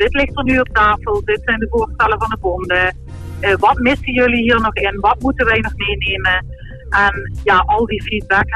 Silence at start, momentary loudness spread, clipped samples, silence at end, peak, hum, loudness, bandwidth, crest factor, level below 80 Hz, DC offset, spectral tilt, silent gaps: 0 s; 6 LU; under 0.1%; 0 s; -2 dBFS; none; -15 LUFS; 12.5 kHz; 14 dB; -28 dBFS; under 0.1%; -6 dB/octave; none